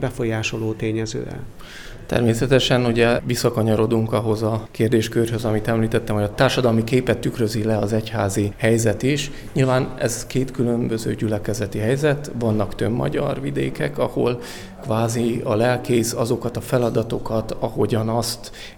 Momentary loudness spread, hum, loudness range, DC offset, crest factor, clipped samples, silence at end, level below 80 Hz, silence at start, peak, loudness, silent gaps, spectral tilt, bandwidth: 7 LU; none; 3 LU; under 0.1%; 18 dB; under 0.1%; 0.05 s; -40 dBFS; 0 s; -4 dBFS; -21 LUFS; none; -5.5 dB/octave; 19 kHz